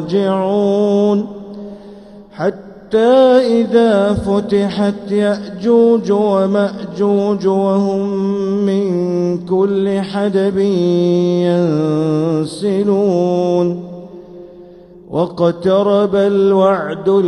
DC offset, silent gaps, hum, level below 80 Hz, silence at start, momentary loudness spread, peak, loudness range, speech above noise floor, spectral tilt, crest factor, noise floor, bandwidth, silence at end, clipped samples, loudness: under 0.1%; none; none; -50 dBFS; 0 s; 9 LU; 0 dBFS; 3 LU; 25 dB; -7.5 dB/octave; 14 dB; -38 dBFS; 11 kHz; 0 s; under 0.1%; -14 LUFS